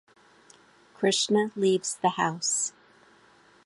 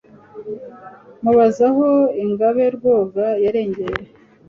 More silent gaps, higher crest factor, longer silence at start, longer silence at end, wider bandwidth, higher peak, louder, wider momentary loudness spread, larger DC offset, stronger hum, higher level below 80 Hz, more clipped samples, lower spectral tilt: neither; about the same, 18 dB vs 16 dB; first, 1 s vs 0.35 s; first, 0.95 s vs 0.45 s; first, 11.5 kHz vs 7.4 kHz; second, -10 dBFS vs -2 dBFS; second, -26 LUFS vs -17 LUFS; second, 4 LU vs 18 LU; neither; neither; second, -78 dBFS vs -52 dBFS; neither; second, -3 dB/octave vs -7.5 dB/octave